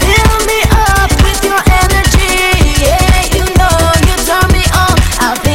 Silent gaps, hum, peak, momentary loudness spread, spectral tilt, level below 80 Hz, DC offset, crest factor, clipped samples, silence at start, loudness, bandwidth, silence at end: none; none; 0 dBFS; 2 LU; -4 dB/octave; -12 dBFS; 2%; 8 dB; 0.2%; 0 s; -9 LUFS; 17 kHz; 0 s